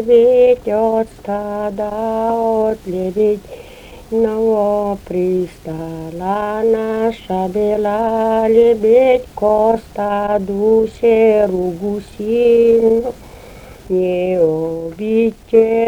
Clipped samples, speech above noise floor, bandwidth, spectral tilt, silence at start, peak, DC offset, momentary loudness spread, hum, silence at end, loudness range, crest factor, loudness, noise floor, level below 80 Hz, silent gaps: under 0.1%; 22 dB; 13.5 kHz; -7.5 dB/octave; 0 s; 0 dBFS; under 0.1%; 12 LU; none; 0 s; 5 LU; 14 dB; -15 LUFS; -37 dBFS; -42 dBFS; none